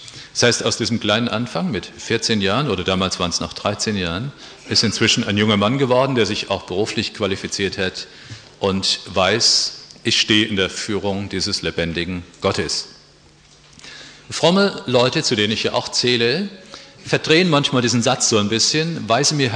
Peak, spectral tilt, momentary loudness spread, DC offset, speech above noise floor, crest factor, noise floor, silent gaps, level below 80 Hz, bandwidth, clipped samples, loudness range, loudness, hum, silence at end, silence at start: -2 dBFS; -3.5 dB/octave; 12 LU; under 0.1%; 30 dB; 18 dB; -49 dBFS; none; -50 dBFS; 10.5 kHz; under 0.1%; 4 LU; -18 LUFS; none; 0 s; 0 s